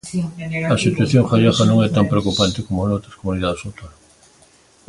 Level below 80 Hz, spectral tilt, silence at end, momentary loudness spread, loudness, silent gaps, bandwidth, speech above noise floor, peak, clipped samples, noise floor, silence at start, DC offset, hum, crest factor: -40 dBFS; -6 dB/octave; 1 s; 11 LU; -18 LUFS; none; 11.5 kHz; 34 dB; 0 dBFS; under 0.1%; -52 dBFS; 0.05 s; under 0.1%; none; 18 dB